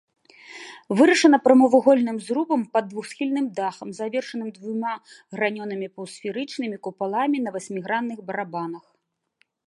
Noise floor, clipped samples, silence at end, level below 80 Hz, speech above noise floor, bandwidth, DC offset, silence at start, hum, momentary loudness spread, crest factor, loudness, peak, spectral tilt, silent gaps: -74 dBFS; under 0.1%; 0.9 s; -78 dBFS; 51 dB; 11.5 kHz; under 0.1%; 0.5 s; none; 18 LU; 22 dB; -23 LUFS; -2 dBFS; -5 dB/octave; none